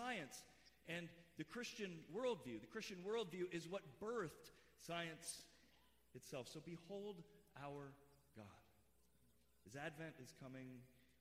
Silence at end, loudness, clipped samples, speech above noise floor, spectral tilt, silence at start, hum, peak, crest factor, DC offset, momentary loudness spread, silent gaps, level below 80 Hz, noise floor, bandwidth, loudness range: 0.15 s; -52 LUFS; under 0.1%; 27 dB; -4 dB/octave; 0 s; none; -34 dBFS; 18 dB; under 0.1%; 17 LU; none; -82 dBFS; -78 dBFS; 15.5 kHz; 9 LU